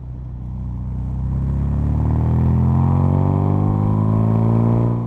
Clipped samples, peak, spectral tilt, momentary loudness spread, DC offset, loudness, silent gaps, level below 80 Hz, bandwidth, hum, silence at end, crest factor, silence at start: under 0.1%; -4 dBFS; -11.5 dB/octave; 11 LU; under 0.1%; -18 LUFS; none; -26 dBFS; 3.5 kHz; none; 0 s; 12 dB; 0 s